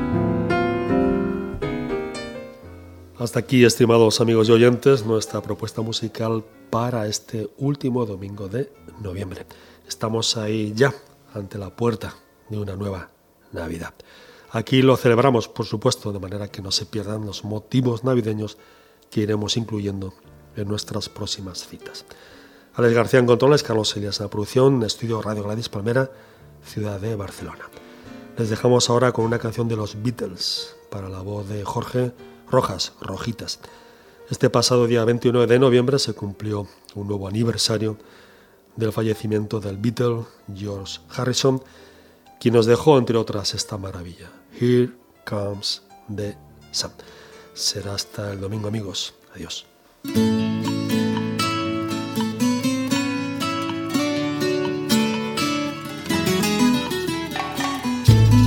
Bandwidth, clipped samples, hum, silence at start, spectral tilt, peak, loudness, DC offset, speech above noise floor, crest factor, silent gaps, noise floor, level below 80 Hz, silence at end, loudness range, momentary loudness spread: 18 kHz; under 0.1%; none; 0 s; -5.5 dB/octave; 0 dBFS; -22 LUFS; under 0.1%; 30 dB; 22 dB; none; -51 dBFS; -46 dBFS; 0 s; 8 LU; 17 LU